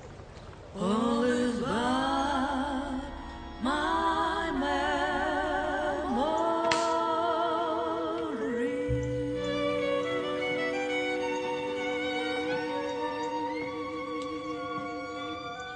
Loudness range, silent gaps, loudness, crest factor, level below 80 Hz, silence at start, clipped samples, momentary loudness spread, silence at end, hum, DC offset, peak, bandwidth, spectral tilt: 4 LU; none; -30 LUFS; 20 dB; -50 dBFS; 0 s; under 0.1%; 9 LU; 0 s; none; under 0.1%; -12 dBFS; 10 kHz; -5 dB/octave